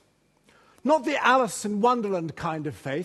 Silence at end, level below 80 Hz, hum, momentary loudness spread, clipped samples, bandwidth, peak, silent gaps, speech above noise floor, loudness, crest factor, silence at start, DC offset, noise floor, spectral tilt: 0 s; -64 dBFS; none; 10 LU; under 0.1%; 12.5 kHz; -6 dBFS; none; 39 dB; -25 LUFS; 20 dB; 0.85 s; under 0.1%; -63 dBFS; -4.5 dB/octave